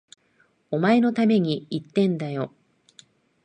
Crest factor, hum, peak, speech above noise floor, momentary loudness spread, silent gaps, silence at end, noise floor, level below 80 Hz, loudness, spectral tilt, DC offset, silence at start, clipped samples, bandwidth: 18 dB; none; -6 dBFS; 42 dB; 11 LU; none; 1 s; -64 dBFS; -72 dBFS; -23 LUFS; -7.5 dB/octave; under 0.1%; 0.7 s; under 0.1%; 9.2 kHz